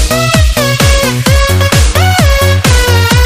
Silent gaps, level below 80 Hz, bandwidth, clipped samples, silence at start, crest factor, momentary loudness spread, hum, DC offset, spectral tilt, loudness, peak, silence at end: none; -12 dBFS; 16 kHz; 0.1%; 0 s; 8 dB; 1 LU; none; under 0.1%; -4 dB/octave; -8 LUFS; 0 dBFS; 0 s